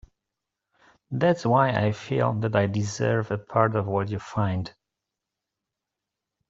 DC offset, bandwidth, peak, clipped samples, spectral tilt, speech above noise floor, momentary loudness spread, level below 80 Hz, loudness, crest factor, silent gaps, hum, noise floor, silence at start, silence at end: under 0.1%; 7.8 kHz; -4 dBFS; under 0.1%; -7 dB/octave; 62 dB; 7 LU; -60 dBFS; -25 LUFS; 22 dB; none; none; -86 dBFS; 1.1 s; 1.8 s